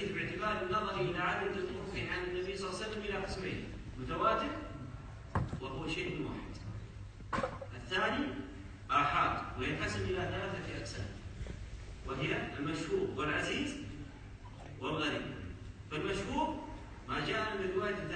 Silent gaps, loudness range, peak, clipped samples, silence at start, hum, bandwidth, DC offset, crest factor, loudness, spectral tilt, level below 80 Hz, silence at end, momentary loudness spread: none; 4 LU; -18 dBFS; under 0.1%; 0 s; none; 9 kHz; under 0.1%; 20 dB; -37 LUFS; -5.5 dB/octave; -52 dBFS; 0 s; 14 LU